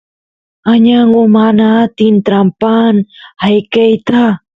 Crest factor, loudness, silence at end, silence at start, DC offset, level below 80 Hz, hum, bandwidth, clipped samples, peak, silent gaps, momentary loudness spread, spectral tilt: 10 dB; -9 LUFS; 0.2 s; 0.65 s; under 0.1%; -52 dBFS; none; 5 kHz; under 0.1%; 0 dBFS; none; 5 LU; -8.5 dB/octave